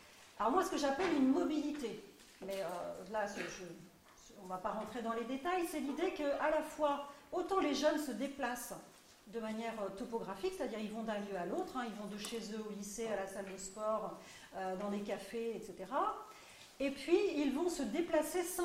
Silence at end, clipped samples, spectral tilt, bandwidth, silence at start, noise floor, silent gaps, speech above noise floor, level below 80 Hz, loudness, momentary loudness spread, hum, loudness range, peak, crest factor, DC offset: 0 s; under 0.1%; -4 dB/octave; 16 kHz; 0 s; -61 dBFS; none; 22 dB; -68 dBFS; -39 LUFS; 14 LU; none; 5 LU; -20 dBFS; 20 dB; under 0.1%